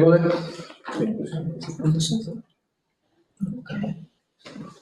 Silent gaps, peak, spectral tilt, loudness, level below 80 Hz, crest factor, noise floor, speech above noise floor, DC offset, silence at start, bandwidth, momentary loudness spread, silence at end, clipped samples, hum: none; -4 dBFS; -6.5 dB/octave; -26 LUFS; -60 dBFS; 22 dB; -76 dBFS; 52 dB; under 0.1%; 0 s; 12 kHz; 18 LU; 0.1 s; under 0.1%; none